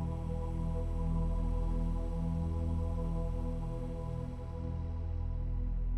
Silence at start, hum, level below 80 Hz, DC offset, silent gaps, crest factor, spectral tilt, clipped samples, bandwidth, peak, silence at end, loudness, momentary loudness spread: 0 s; none; -36 dBFS; under 0.1%; none; 10 dB; -9.5 dB/octave; under 0.1%; 8 kHz; -24 dBFS; 0 s; -37 LUFS; 5 LU